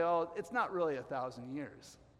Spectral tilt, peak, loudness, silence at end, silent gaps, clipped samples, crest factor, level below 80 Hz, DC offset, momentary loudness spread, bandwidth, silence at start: -6 dB/octave; -22 dBFS; -37 LUFS; 0.25 s; none; under 0.1%; 16 dB; -72 dBFS; under 0.1%; 12 LU; 13 kHz; 0 s